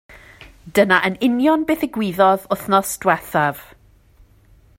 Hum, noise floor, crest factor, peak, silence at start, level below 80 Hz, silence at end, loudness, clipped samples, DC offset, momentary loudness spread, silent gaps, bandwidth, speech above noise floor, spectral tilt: none; -51 dBFS; 20 dB; 0 dBFS; 0.4 s; -52 dBFS; 1.15 s; -18 LUFS; under 0.1%; under 0.1%; 6 LU; none; 16.5 kHz; 34 dB; -4.5 dB/octave